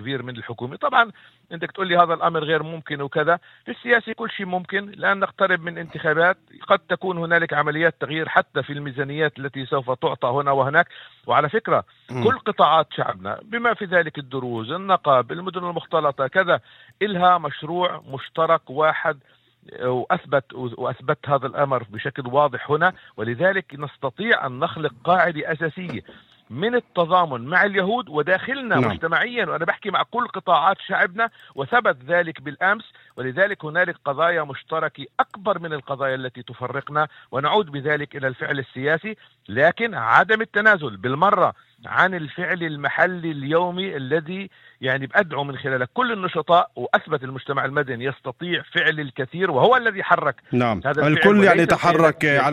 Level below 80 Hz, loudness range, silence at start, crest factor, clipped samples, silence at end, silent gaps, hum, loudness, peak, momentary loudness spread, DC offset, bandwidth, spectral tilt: -62 dBFS; 4 LU; 0 s; 22 dB; under 0.1%; 0 s; none; none; -21 LUFS; 0 dBFS; 12 LU; under 0.1%; 12.5 kHz; -6.5 dB/octave